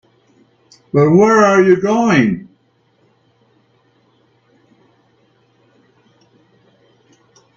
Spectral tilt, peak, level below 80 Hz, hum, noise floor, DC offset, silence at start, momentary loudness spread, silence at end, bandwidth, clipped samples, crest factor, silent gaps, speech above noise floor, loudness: -6.5 dB/octave; 0 dBFS; -56 dBFS; none; -58 dBFS; under 0.1%; 0.95 s; 9 LU; 5.15 s; 7.6 kHz; under 0.1%; 18 dB; none; 47 dB; -12 LUFS